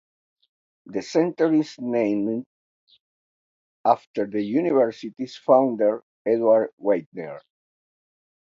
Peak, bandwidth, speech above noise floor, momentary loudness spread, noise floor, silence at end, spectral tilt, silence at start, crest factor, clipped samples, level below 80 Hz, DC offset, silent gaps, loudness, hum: -4 dBFS; 7.6 kHz; over 68 dB; 14 LU; under -90 dBFS; 1.05 s; -7 dB/octave; 0.85 s; 20 dB; under 0.1%; -74 dBFS; under 0.1%; 2.46-2.87 s, 3.00-3.84 s, 4.07-4.14 s, 6.03-6.25 s, 6.73-6.77 s, 7.06-7.12 s; -23 LUFS; none